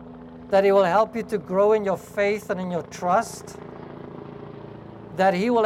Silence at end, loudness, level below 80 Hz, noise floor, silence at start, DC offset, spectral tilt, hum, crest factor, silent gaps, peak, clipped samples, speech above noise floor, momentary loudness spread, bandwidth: 0 s; -22 LUFS; -58 dBFS; -41 dBFS; 0 s; under 0.1%; -6 dB/octave; none; 16 dB; none; -8 dBFS; under 0.1%; 19 dB; 21 LU; 15 kHz